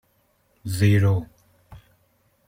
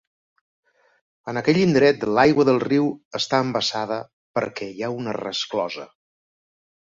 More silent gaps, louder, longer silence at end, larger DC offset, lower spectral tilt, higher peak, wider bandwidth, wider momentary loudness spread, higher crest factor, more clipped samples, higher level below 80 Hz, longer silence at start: second, none vs 3.05-3.11 s, 4.13-4.34 s; about the same, -21 LUFS vs -22 LUFS; second, 0.7 s vs 1.05 s; neither; first, -7 dB/octave vs -5.5 dB/octave; second, -8 dBFS vs -4 dBFS; first, 16 kHz vs 7.8 kHz; first, 21 LU vs 13 LU; about the same, 18 dB vs 20 dB; neither; first, -54 dBFS vs -60 dBFS; second, 0.65 s vs 1.25 s